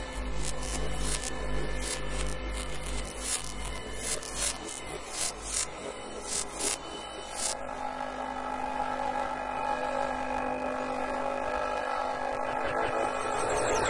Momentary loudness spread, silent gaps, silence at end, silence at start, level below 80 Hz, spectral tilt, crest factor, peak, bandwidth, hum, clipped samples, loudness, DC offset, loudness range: 7 LU; none; 0 s; 0 s; -42 dBFS; -2.5 dB/octave; 18 dB; -14 dBFS; 11.5 kHz; none; under 0.1%; -33 LUFS; under 0.1%; 2 LU